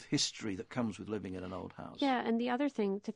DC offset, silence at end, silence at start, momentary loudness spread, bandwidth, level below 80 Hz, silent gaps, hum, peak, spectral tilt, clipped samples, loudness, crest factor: under 0.1%; 0.05 s; 0 s; 10 LU; 10 kHz; -72 dBFS; none; none; -20 dBFS; -4 dB/octave; under 0.1%; -36 LUFS; 16 dB